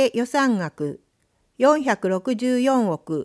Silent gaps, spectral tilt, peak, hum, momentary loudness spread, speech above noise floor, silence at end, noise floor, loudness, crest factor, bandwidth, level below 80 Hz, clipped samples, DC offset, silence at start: none; -5.5 dB/octave; -4 dBFS; none; 11 LU; 47 dB; 0 s; -67 dBFS; -21 LUFS; 18 dB; 11 kHz; -70 dBFS; under 0.1%; under 0.1%; 0 s